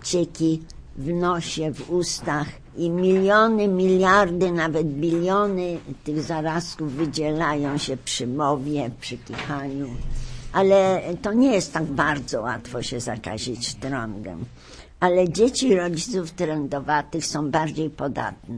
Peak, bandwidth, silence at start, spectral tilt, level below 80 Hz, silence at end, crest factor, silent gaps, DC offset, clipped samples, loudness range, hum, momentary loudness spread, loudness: -4 dBFS; 11 kHz; 0 s; -5 dB/octave; -42 dBFS; 0 s; 18 dB; none; under 0.1%; under 0.1%; 6 LU; none; 12 LU; -23 LUFS